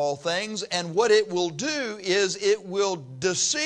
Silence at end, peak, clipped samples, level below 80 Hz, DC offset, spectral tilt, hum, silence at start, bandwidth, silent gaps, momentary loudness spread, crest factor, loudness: 0 s; -8 dBFS; under 0.1%; -70 dBFS; under 0.1%; -2.5 dB/octave; none; 0 s; 10.5 kHz; none; 7 LU; 16 dB; -25 LUFS